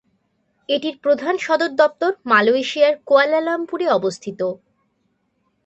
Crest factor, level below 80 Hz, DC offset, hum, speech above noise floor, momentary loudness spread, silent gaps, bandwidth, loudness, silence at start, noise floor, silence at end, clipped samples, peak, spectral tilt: 18 dB; -70 dBFS; under 0.1%; none; 50 dB; 10 LU; none; 8.4 kHz; -18 LUFS; 0.7 s; -68 dBFS; 1.1 s; under 0.1%; -2 dBFS; -4 dB/octave